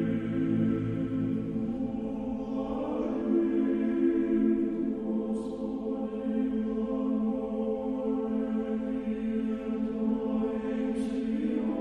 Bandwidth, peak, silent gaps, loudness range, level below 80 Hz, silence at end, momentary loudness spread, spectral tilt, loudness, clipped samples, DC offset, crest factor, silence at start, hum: 9.6 kHz; -16 dBFS; none; 2 LU; -54 dBFS; 0 s; 6 LU; -9 dB/octave; -30 LUFS; under 0.1%; under 0.1%; 14 dB; 0 s; none